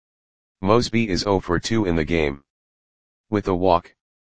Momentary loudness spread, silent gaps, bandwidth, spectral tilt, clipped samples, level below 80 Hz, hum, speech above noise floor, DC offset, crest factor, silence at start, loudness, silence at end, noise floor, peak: 7 LU; 2.50-3.24 s; 9.8 kHz; -6 dB/octave; under 0.1%; -42 dBFS; none; over 70 dB; 1%; 22 dB; 0.55 s; -21 LUFS; 0.35 s; under -90 dBFS; 0 dBFS